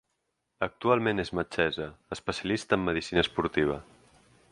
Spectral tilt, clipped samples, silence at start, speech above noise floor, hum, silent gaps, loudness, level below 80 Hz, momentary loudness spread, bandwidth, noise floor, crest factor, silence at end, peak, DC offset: -5.5 dB/octave; under 0.1%; 0.6 s; 51 dB; none; none; -29 LUFS; -52 dBFS; 10 LU; 11 kHz; -80 dBFS; 22 dB; 0.7 s; -8 dBFS; under 0.1%